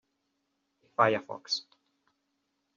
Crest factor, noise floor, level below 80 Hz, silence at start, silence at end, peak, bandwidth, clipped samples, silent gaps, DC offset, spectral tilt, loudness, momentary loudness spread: 26 dB; -79 dBFS; -82 dBFS; 1 s; 1.15 s; -8 dBFS; 7.4 kHz; under 0.1%; none; under 0.1%; -2 dB/octave; -30 LUFS; 8 LU